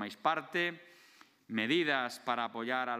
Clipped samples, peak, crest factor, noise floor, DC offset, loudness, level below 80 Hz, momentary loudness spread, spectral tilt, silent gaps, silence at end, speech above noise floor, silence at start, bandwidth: under 0.1%; -16 dBFS; 20 dB; -62 dBFS; under 0.1%; -33 LUFS; -88 dBFS; 6 LU; -4.5 dB/octave; none; 0 s; 28 dB; 0 s; 15.5 kHz